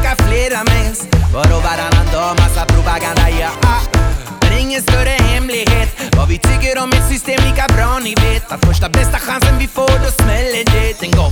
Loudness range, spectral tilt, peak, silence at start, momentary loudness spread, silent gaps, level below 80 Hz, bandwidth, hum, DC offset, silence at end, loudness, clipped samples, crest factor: 0 LU; -4.5 dB/octave; 0 dBFS; 0 s; 3 LU; none; -16 dBFS; 19.5 kHz; none; under 0.1%; 0 s; -13 LUFS; under 0.1%; 12 dB